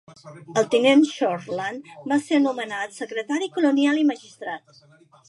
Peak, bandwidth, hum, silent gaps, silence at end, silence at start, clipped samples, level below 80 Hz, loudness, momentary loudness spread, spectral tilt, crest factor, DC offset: -6 dBFS; 11.5 kHz; none; none; 0.7 s; 0.1 s; under 0.1%; -76 dBFS; -22 LUFS; 16 LU; -4.5 dB/octave; 18 dB; under 0.1%